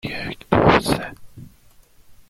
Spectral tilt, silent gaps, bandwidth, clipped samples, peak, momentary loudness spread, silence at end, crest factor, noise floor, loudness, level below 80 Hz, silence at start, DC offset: -5.5 dB/octave; none; 16.5 kHz; under 0.1%; -2 dBFS; 14 LU; 0.15 s; 20 dB; -51 dBFS; -19 LUFS; -40 dBFS; 0.05 s; under 0.1%